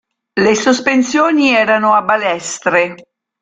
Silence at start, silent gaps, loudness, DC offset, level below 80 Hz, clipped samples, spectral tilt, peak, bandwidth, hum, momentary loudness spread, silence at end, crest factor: 0.35 s; none; -13 LUFS; under 0.1%; -56 dBFS; under 0.1%; -3.5 dB/octave; 0 dBFS; 9.6 kHz; none; 7 LU; 0.4 s; 14 dB